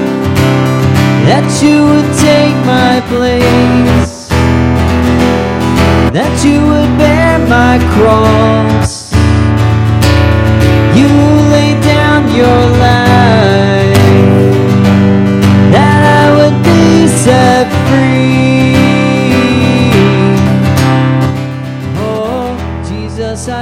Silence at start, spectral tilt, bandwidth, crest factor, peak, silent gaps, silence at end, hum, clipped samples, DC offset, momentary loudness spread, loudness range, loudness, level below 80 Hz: 0 s; -6.5 dB/octave; 16 kHz; 8 dB; 0 dBFS; none; 0 s; none; 1%; 0.2%; 6 LU; 3 LU; -8 LUFS; -22 dBFS